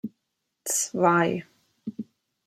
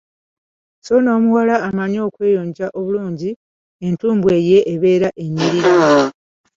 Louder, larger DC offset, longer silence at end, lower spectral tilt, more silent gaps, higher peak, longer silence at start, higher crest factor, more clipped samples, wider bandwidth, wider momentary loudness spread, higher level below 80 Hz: second, -24 LUFS vs -16 LUFS; neither; about the same, 0.45 s vs 0.45 s; second, -4 dB/octave vs -6.5 dB/octave; second, none vs 3.36-3.79 s; second, -6 dBFS vs -2 dBFS; second, 0.05 s vs 0.85 s; first, 22 dB vs 14 dB; neither; first, 16 kHz vs 7.6 kHz; first, 20 LU vs 11 LU; second, -74 dBFS vs -56 dBFS